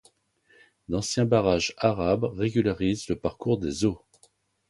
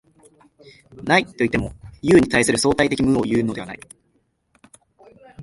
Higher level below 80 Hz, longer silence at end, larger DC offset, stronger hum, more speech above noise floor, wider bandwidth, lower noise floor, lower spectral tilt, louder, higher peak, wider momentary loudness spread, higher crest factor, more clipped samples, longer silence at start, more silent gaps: about the same, -48 dBFS vs -44 dBFS; first, 0.75 s vs 0 s; neither; neither; second, 39 dB vs 47 dB; about the same, 11.5 kHz vs 12 kHz; about the same, -64 dBFS vs -66 dBFS; about the same, -5.5 dB/octave vs -4.5 dB/octave; second, -26 LUFS vs -19 LUFS; second, -6 dBFS vs -2 dBFS; second, 8 LU vs 18 LU; about the same, 20 dB vs 20 dB; neither; about the same, 0.9 s vs 0.95 s; neither